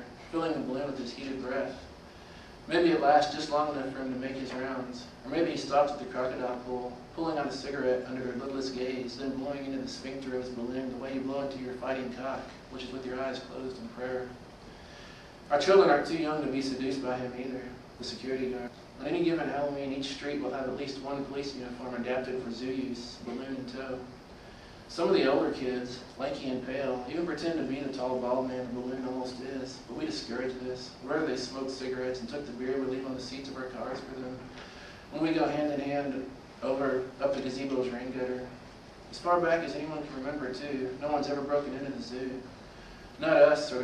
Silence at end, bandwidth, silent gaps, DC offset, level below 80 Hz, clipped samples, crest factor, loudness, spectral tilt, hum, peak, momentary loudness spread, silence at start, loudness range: 0 s; 11.5 kHz; none; under 0.1%; -58 dBFS; under 0.1%; 24 dB; -32 LUFS; -5.5 dB/octave; none; -10 dBFS; 15 LU; 0 s; 7 LU